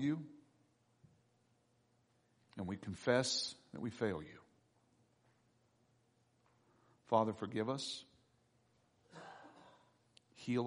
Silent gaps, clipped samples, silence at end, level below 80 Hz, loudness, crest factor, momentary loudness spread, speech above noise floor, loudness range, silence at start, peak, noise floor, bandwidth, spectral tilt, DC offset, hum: none; under 0.1%; 0 s; -78 dBFS; -40 LUFS; 26 dB; 22 LU; 37 dB; 7 LU; 0 s; -18 dBFS; -76 dBFS; 10 kHz; -4.5 dB/octave; under 0.1%; none